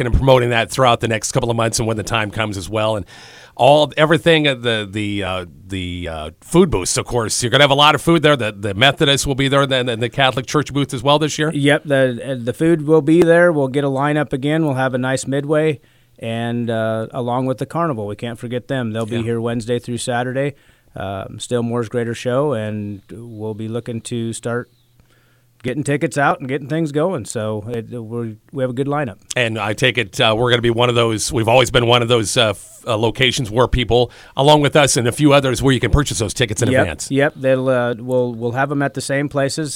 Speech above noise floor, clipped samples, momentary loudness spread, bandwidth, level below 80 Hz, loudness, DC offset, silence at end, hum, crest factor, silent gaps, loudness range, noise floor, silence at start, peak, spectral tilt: 38 dB; under 0.1%; 13 LU; 16.5 kHz; -36 dBFS; -17 LUFS; under 0.1%; 0 s; none; 18 dB; none; 8 LU; -55 dBFS; 0 s; 0 dBFS; -4.5 dB/octave